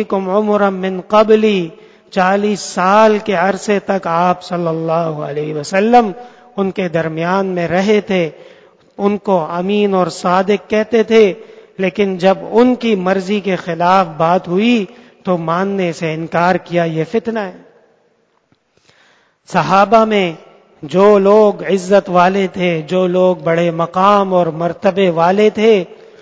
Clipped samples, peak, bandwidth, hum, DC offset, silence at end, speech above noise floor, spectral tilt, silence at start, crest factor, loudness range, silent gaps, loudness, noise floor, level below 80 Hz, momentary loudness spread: 0.1%; 0 dBFS; 8 kHz; none; under 0.1%; 0.25 s; 45 dB; -6 dB/octave; 0 s; 14 dB; 5 LU; none; -14 LUFS; -59 dBFS; -56 dBFS; 9 LU